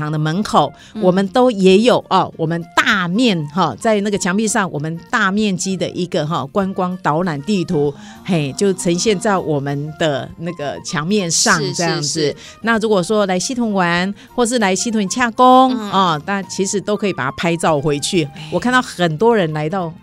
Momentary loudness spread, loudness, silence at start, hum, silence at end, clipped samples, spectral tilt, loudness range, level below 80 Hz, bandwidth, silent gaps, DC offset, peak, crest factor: 8 LU; -16 LUFS; 0 s; none; 0.05 s; under 0.1%; -4.5 dB/octave; 4 LU; -50 dBFS; 15 kHz; none; under 0.1%; 0 dBFS; 16 dB